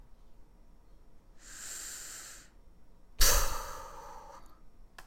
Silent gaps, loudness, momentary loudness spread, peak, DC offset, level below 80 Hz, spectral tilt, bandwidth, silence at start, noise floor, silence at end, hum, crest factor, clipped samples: none; -33 LUFS; 27 LU; -10 dBFS; under 0.1%; -40 dBFS; -1 dB/octave; 16.5 kHz; 0.1 s; -56 dBFS; 0.05 s; none; 26 dB; under 0.1%